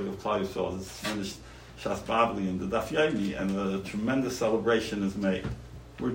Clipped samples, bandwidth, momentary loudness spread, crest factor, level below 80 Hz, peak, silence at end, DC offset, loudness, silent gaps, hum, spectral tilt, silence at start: under 0.1%; 16.5 kHz; 12 LU; 18 dB; -52 dBFS; -10 dBFS; 0 s; under 0.1%; -30 LUFS; none; none; -5.5 dB/octave; 0 s